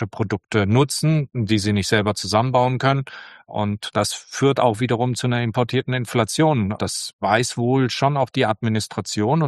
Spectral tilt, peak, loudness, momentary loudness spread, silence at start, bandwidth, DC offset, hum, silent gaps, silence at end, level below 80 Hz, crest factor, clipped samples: -5.5 dB/octave; -2 dBFS; -20 LUFS; 7 LU; 0 s; 12.5 kHz; under 0.1%; none; 7.13-7.19 s; 0 s; -54 dBFS; 18 dB; under 0.1%